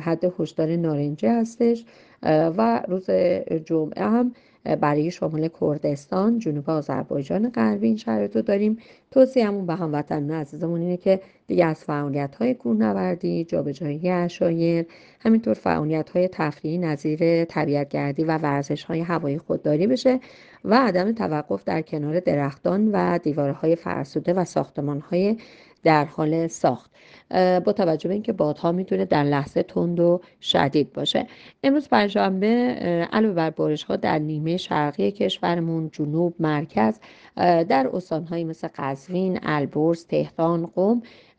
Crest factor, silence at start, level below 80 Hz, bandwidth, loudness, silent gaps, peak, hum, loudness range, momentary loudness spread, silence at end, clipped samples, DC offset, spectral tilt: 20 dB; 0 s; -62 dBFS; 8.8 kHz; -23 LUFS; none; -4 dBFS; none; 2 LU; 7 LU; 0.3 s; under 0.1%; under 0.1%; -7 dB/octave